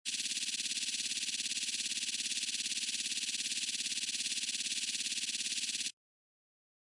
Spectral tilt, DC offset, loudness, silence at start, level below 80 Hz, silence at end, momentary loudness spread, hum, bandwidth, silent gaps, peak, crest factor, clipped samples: 3 dB/octave; under 0.1%; -34 LUFS; 0.05 s; under -90 dBFS; 0.95 s; 0 LU; none; 12 kHz; none; -22 dBFS; 16 dB; under 0.1%